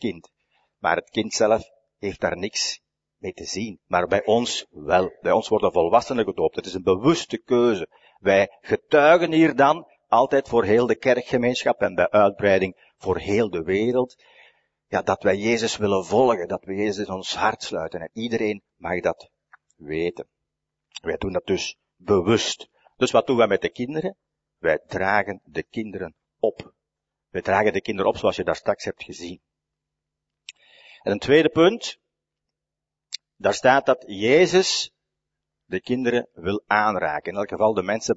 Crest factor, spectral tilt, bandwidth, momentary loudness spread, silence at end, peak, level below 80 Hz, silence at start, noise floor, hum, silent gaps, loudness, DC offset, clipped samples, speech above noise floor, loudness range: 20 dB; -4.5 dB/octave; 8 kHz; 14 LU; 0 s; -2 dBFS; -56 dBFS; 0 s; -86 dBFS; none; none; -22 LUFS; under 0.1%; under 0.1%; 64 dB; 8 LU